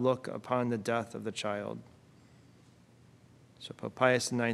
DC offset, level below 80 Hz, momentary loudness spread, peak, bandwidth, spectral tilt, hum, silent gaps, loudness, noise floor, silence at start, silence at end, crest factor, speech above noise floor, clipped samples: under 0.1%; -74 dBFS; 17 LU; -10 dBFS; 13.5 kHz; -4.5 dB/octave; none; none; -33 LUFS; -60 dBFS; 0 s; 0 s; 24 dB; 28 dB; under 0.1%